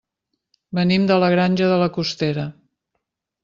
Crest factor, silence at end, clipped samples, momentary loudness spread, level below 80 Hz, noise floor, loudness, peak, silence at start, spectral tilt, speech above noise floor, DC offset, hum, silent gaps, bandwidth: 16 dB; 0.9 s; under 0.1%; 11 LU; -58 dBFS; -77 dBFS; -19 LUFS; -4 dBFS; 0.7 s; -7 dB/octave; 59 dB; under 0.1%; none; none; 7.4 kHz